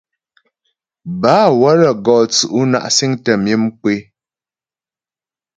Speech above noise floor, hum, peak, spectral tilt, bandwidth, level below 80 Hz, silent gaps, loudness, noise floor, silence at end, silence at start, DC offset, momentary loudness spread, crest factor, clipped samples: over 77 dB; none; 0 dBFS; -4.5 dB/octave; 9.4 kHz; -58 dBFS; none; -13 LUFS; under -90 dBFS; 1.55 s; 1.05 s; under 0.1%; 9 LU; 16 dB; under 0.1%